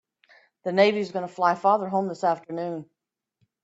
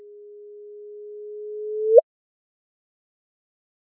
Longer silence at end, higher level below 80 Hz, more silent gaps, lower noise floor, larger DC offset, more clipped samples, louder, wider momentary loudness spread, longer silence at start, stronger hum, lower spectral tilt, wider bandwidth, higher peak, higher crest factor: second, 0.8 s vs 2 s; first, -74 dBFS vs under -90 dBFS; neither; first, -72 dBFS vs -43 dBFS; neither; neither; second, -25 LUFS vs -20 LUFS; second, 12 LU vs 26 LU; first, 0.65 s vs 0.2 s; neither; first, -6 dB/octave vs 12.5 dB/octave; first, 8 kHz vs 0.9 kHz; second, -6 dBFS vs -2 dBFS; second, 20 dB vs 26 dB